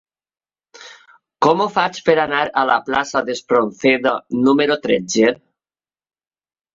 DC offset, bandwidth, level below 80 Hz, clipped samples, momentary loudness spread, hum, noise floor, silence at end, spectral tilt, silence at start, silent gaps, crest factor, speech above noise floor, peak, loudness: under 0.1%; 7.8 kHz; -58 dBFS; under 0.1%; 4 LU; none; under -90 dBFS; 1.4 s; -4 dB/octave; 0.8 s; none; 18 dB; over 73 dB; -2 dBFS; -17 LUFS